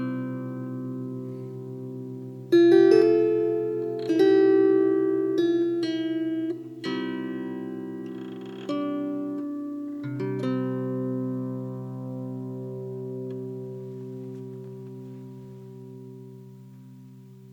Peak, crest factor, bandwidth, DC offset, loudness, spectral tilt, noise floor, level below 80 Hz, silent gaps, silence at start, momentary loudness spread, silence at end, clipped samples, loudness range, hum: -6 dBFS; 20 dB; 6.8 kHz; under 0.1%; -26 LUFS; -8 dB/octave; -47 dBFS; -80 dBFS; none; 0 s; 22 LU; 0 s; under 0.1%; 17 LU; none